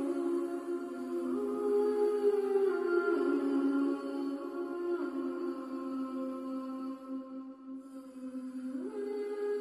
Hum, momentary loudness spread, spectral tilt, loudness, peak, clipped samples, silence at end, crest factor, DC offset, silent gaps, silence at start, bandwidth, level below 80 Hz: none; 13 LU; -5.5 dB/octave; -34 LUFS; -18 dBFS; under 0.1%; 0 s; 16 dB; under 0.1%; none; 0 s; 12.5 kHz; -82 dBFS